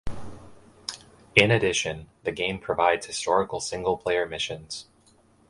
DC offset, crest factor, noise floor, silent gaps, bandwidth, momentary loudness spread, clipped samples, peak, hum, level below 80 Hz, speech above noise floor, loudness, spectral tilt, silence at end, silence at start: under 0.1%; 26 dB; -60 dBFS; none; 11.5 kHz; 17 LU; under 0.1%; 0 dBFS; none; -50 dBFS; 34 dB; -25 LUFS; -3.5 dB/octave; 0.65 s; 0.05 s